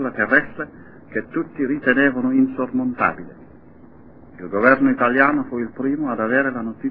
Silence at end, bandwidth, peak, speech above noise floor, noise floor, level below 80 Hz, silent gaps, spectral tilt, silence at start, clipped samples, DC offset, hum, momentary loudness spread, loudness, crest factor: 0 s; 4.7 kHz; 0 dBFS; 26 dB; -46 dBFS; -54 dBFS; none; -11 dB/octave; 0 s; under 0.1%; 0.4%; none; 14 LU; -19 LUFS; 20 dB